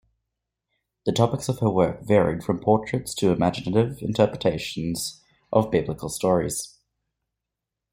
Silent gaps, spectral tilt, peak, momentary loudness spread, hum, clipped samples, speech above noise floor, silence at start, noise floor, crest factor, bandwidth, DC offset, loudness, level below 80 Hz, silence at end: none; -6 dB/octave; -4 dBFS; 8 LU; none; under 0.1%; 62 dB; 1.05 s; -85 dBFS; 22 dB; 16.5 kHz; under 0.1%; -24 LUFS; -52 dBFS; 1.25 s